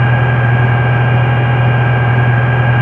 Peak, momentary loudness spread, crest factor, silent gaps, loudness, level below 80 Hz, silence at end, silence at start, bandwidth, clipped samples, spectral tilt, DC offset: -2 dBFS; 0 LU; 10 dB; none; -11 LUFS; -36 dBFS; 0 s; 0 s; 3.7 kHz; under 0.1%; -9.5 dB/octave; under 0.1%